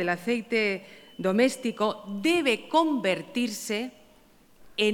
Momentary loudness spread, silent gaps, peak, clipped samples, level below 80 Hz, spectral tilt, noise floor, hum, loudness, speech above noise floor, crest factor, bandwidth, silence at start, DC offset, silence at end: 8 LU; none; -10 dBFS; under 0.1%; -68 dBFS; -4 dB/octave; -57 dBFS; none; -27 LUFS; 31 dB; 18 dB; 18 kHz; 0 s; under 0.1%; 0 s